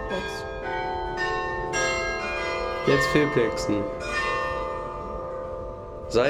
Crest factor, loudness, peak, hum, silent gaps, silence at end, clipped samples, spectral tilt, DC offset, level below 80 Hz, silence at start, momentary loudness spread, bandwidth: 18 dB; -26 LUFS; -8 dBFS; none; none; 0 s; under 0.1%; -4.5 dB/octave; under 0.1%; -42 dBFS; 0 s; 12 LU; 17 kHz